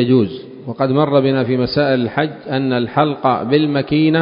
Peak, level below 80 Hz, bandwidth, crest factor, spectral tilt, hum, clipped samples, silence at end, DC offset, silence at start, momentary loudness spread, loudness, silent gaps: 0 dBFS; -50 dBFS; 5.4 kHz; 16 dB; -11.5 dB/octave; none; under 0.1%; 0 s; under 0.1%; 0 s; 7 LU; -16 LUFS; none